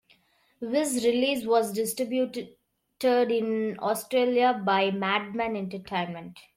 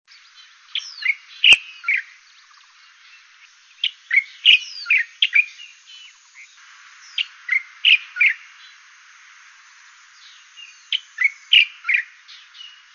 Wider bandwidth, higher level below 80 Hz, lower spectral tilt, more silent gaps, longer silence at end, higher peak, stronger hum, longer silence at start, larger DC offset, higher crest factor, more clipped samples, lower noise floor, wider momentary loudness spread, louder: first, 16.5 kHz vs 8.8 kHz; about the same, -68 dBFS vs -68 dBFS; first, -4 dB/octave vs 3 dB/octave; neither; about the same, 0.15 s vs 0.25 s; second, -12 dBFS vs 0 dBFS; neither; second, 0.6 s vs 0.75 s; neither; second, 16 dB vs 22 dB; neither; first, -64 dBFS vs -50 dBFS; second, 9 LU vs 16 LU; second, -26 LUFS vs -17 LUFS